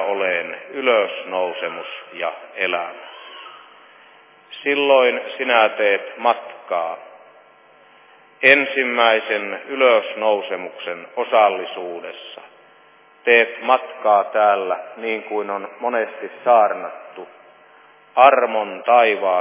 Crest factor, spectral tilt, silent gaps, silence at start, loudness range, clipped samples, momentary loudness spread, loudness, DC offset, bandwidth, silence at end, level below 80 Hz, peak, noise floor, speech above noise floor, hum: 20 dB; -6 dB/octave; none; 0 s; 5 LU; under 0.1%; 18 LU; -18 LUFS; under 0.1%; 4 kHz; 0 s; -84 dBFS; 0 dBFS; -51 dBFS; 32 dB; none